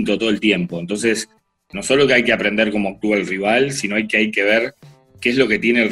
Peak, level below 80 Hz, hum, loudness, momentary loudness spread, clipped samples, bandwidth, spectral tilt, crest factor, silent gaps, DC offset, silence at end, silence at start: -2 dBFS; -52 dBFS; none; -17 LUFS; 9 LU; under 0.1%; 12.5 kHz; -4 dB/octave; 16 dB; none; under 0.1%; 0 s; 0 s